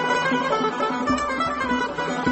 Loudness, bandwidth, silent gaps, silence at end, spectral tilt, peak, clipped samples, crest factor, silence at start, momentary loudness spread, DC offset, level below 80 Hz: -23 LUFS; 8.4 kHz; none; 0 s; -4.5 dB/octave; -8 dBFS; under 0.1%; 14 dB; 0 s; 3 LU; under 0.1%; -48 dBFS